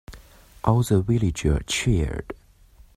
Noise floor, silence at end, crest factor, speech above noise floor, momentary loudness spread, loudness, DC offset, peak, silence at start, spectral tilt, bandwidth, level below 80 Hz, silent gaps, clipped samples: -52 dBFS; 0.6 s; 22 dB; 30 dB; 14 LU; -23 LUFS; under 0.1%; -2 dBFS; 0.1 s; -6 dB/octave; 14.5 kHz; -34 dBFS; none; under 0.1%